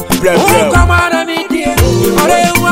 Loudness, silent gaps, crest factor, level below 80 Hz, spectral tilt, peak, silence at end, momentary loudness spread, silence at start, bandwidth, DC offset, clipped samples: -10 LUFS; none; 10 dB; -20 dBFS; -4.5 dB/octave; 0 dBFS; 0 s; 6 LU; 0 s; 16.5 kHz; under 0.1%; 0.2%